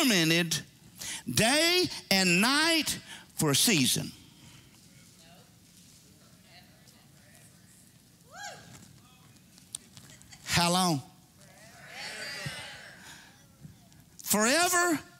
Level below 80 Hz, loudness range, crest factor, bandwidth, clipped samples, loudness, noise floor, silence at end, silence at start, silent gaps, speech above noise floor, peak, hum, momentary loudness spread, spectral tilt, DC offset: -64 dBFS; 25 LU; 22 dB; 16 kHz; under 0.1%; -26 LUFS; -58 dBFS; 0.15 s; 0 s; none; 32 dB; -8 dBFS; none; 21 LU; -2.5 dB/octave; under 0.1%